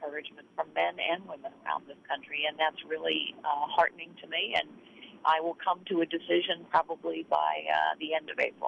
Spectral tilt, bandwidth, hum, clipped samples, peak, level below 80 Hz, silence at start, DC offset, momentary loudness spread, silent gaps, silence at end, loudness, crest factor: -4.5 dB/octave; 8 kHz; none; under 0.1%; -12 dBFS; -76 dBFS; 0 s; under 0.1%; 11 LU; none; 0 s; -31 LUFS; 18 dB